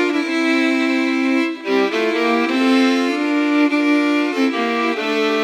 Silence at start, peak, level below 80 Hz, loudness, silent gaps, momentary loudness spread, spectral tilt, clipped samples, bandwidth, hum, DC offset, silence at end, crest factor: 0 s; -4 dBFS; under -90 dBFS; -17 LUFS; none; 3 LU; -3.5 dB/octave; under 0.1%; 12.5 kHz; none; under 0.1%; 0 s; 12 dB